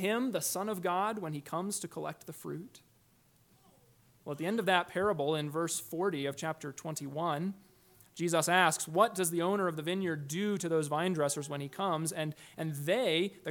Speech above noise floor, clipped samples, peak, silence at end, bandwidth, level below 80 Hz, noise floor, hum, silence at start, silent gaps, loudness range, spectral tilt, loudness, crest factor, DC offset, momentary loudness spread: 34 dB; under 0.1%; -12 dBFS; 0 s; 19 kHz; -76 dBFS; -67 dBFS; none; 0 s; none; 7 LU; -4 dB/octave; -33 LUFS; 22 dB; under 0.1%; 12 LU